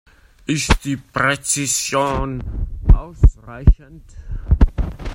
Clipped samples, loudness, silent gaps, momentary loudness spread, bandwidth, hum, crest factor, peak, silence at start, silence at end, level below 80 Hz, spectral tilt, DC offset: under 0.1%; -19 LUFS; none; 10 LU; 16.5 kHz; none; 18 dB; 0 dBFS; 0.5 s; 0 s; -20 dBFS; -4.5 dB/octave; under 0.1%